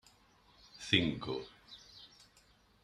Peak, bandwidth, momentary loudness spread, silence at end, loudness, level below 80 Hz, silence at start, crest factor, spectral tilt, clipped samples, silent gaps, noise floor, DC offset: -12 dBFS; 13.5 kHz; 25 LU; 0.75 s; -34 LUFS; -66 dBFS; 0.75 s; 28 dB; -4.5 dB/octave; under 0.1%; none; -67 dBFS; under 0.1%